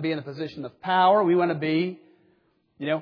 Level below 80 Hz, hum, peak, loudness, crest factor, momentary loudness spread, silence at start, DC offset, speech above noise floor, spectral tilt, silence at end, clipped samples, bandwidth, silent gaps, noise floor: -72 dBFS; none; -8 dBFS; -24 LUFS; 16 dB; 16 LU; 0 s; under 0.1%; 43 dB; -8.5 dB/octave; 0 s; under 0.1%; 5.4 kHz; none; -66 dBFS